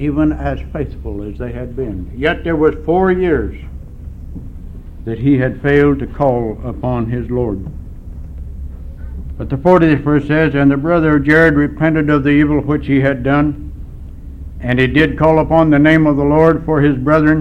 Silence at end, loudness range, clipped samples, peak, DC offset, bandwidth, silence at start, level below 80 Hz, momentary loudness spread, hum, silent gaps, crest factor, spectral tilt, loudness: 0 s; 6 LU; under 0.1%; 0 dBFS; under 0.1%; 6 kHz; 0 s; -28 dBFS; 21 LU; none; none; 14 dB; -9 dB/octave; -14 LUFS